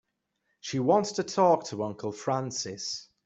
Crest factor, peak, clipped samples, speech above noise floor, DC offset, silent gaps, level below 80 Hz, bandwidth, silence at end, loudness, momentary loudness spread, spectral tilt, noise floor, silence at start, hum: 20 dB; -10 dBFS; under 0.1%; 50 dB; under 0.1%; none; -72 dBFS; 8.2 kHz; 0.2 s; -28 LUFS; 11 LU; -4.5 dB/octave; -78 dBFS; 0.65 s; none